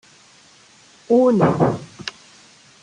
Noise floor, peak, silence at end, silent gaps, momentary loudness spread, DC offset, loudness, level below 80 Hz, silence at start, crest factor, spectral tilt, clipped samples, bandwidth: -50 dBFS; -2 dBFS; 0.75 s; none; 18 LU; under 0.1%; -17 LUFS; -54 dBFS; 1.1 s; 18 dB; -7.5 dB/octave; under 0.1%; 10 kHz